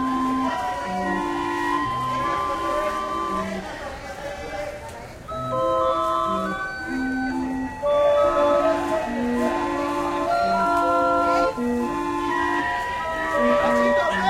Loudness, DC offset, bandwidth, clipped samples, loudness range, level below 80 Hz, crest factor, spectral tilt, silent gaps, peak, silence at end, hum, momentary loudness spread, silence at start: -23 LUFS; under 0.1%; 15.5 kHz; under 0.1%; 5 LU; -46 dBFS; 14 dB; -5 dB/octave; none; -8 dBFS; 0 s; none; 12 LU; 0 s